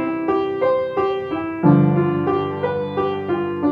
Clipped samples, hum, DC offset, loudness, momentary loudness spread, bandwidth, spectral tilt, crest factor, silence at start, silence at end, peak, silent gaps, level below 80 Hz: under 0.1%; none; under 0.1%; -20 LUFS; 8 LU; 5.2 kHz; -10 dB/octave; 18 dB; 0 s; 0 s; 0 dBFS; none; -54 dBFS